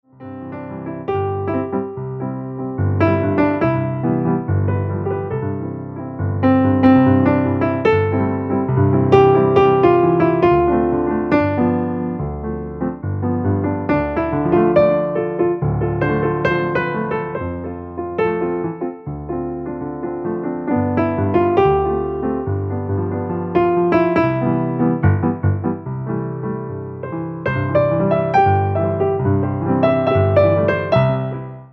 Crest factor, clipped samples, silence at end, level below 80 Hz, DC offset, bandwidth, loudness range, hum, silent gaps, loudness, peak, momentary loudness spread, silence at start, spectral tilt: 16 dB; under 0.1%; 0.05 s; -40 dBFS; under 0.1%; 6 kHz; 7 LU; none; none; -18 LUFS; 0 dBFS; 13 LU; 0.2 s; -10 dB/octave